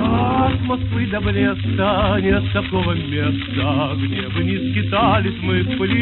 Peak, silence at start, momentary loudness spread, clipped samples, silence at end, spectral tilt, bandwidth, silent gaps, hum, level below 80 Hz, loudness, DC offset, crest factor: -4 dBFS; 0 s; 4 LU; under 0.1%; 0 s; -12 dB/octave; 4.3 kHz; none; none; -34 dBFS; -19 LUFS; under 0.1%; 14 dB